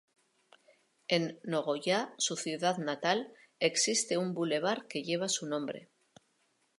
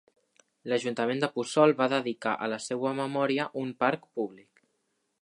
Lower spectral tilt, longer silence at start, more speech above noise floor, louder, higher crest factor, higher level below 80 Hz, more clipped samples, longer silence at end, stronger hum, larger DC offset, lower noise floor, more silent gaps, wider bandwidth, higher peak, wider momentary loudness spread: second, -3 dB/octave vs -5 dB/octave; first, 1.1 s vs 0.65 s; second, 42 dB vs 49 dB; second, -32 LUFS vs -29 LUFS; about the same, 22 dB vs 22 dB; about the same, -86 dBFS vs -82 dBFS; neither; first, 0.95 s vs 0.8 s; neither; neither; about the same, -75 dBFS vs -77 dBFS; neither; about the same, 11.5 kHz vs 11.5 kHz; second, -12 dBFS vs -8 dBFS; about the same, 8 LU vs 10 LU